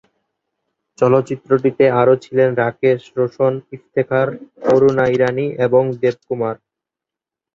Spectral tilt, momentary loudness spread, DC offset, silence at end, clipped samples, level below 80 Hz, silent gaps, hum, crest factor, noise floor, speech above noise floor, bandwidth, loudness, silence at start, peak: -8 dB/octave; 9 LU; under 0.1%; 1 s; under 0.1%; -58 dBFS; none; none; 16 dB; -86 dBFS; 70 dB; 7.6 kHz; -16 LUFS; 1 s; -2 dBFS